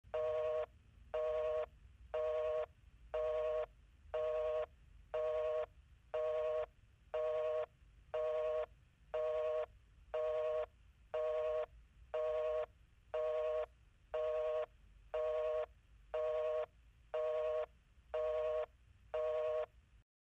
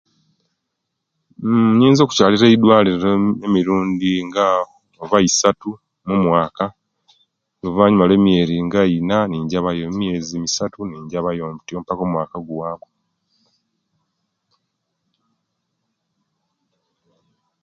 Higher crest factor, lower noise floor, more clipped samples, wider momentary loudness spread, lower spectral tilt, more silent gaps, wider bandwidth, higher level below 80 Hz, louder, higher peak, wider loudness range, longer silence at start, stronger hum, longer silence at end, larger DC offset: second, 12 dB vs 18 dB; second, -62 dBFS vs -77 dBFS; neither; second, 11 LU vs 15 LU; about the same, -4.5 dB/octave vs -5.5 dB/octave; neither; about the same, 7.4 kHz vs 7.6 kHz; second, -64 dBFS vs -50 dBFS; second, -41 LUFS vs -17 LUFS; second, -30 dBFS vs 0 dBFS; second, 0 LU vs 13 LU; second, 0.05 s vs 1.4 s; neither; second, 0.45 s vs 4.85 s; neither